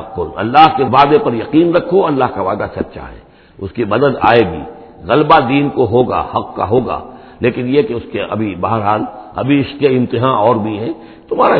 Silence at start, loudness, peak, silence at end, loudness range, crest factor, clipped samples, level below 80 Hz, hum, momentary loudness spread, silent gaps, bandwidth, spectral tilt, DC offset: 0 s; -13 LUFS; 0 dBFS; 0 s; 4 LU; 14 dB; 0.2%; -42 dBFS; none; 14 LU; none; 5.4 kHz; -9 dB/octave; under 0.1%